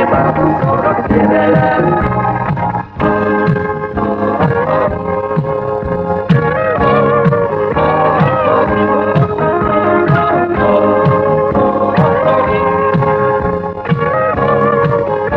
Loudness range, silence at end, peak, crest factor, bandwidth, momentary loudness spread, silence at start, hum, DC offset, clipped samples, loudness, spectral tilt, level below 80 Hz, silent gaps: 3 LU; 0 s; 0 dBFS; 12 dB; 5.8 kHz; 6 LU; 0 s; none; under 0.1%; under 0.1%; -12 LUFS; -10 dB/octave; -34 dBFS; none